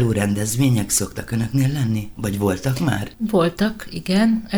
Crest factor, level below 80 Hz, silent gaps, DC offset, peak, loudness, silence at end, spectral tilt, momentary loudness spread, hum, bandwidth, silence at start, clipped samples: 16 dB; -42 dBFS; none; under 0.1%; -4 dBFS; -21 LUFS; 0 s; -5.5 dB/octave; 7 LU; none; over 20 kHz; 0 s; under 0.1%